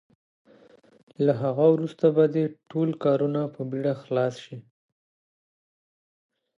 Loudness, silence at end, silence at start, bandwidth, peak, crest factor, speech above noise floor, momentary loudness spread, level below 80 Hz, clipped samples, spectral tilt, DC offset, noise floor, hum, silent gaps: -25 LUFS; 2 s; 1.2 s; 7.4 kHz; -8 dBFS; 20 dB; 32 dB; 9 LU; -76 dBFS; under 0.1%; -9 dB/octave; under 0.1%; -56 dBFS; none; none